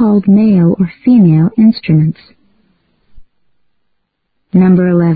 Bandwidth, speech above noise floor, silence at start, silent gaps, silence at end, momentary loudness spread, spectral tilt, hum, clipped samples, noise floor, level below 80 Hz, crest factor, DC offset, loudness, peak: 4.9 kHz; 57 dB; 0 s; none; 0 s; 6 LU; -13.5 dB/octave; none; under 0.1%; -65 dBFS; -46 dBFS; 10 dB; 0.1%; -9 LUFS; 0 dBFS